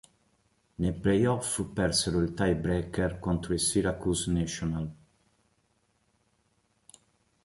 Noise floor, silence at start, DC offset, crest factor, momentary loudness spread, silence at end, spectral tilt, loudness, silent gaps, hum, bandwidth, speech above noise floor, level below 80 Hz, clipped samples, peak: -72 dBFS; 0.8 s; under 0.1%; 18 dB; 7 LU; 2.5 s; -5 dB/octave; -29 LUFS; none; none; 12 kHz; 43 dB; -46 dBFS; under 0.1%; -14 dBFS